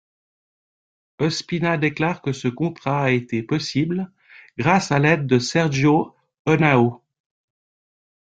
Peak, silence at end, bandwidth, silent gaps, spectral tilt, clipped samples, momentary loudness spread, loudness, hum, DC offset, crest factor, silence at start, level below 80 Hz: -2 dBFS; 1.25 s; 9.2 kHz; 6.39-6.45 s; -6 dB/octave; under 0.1%; 8 LU; -20 LUFS; none; under 0.1%; 20 dB; 1.2 s; -56 dBFS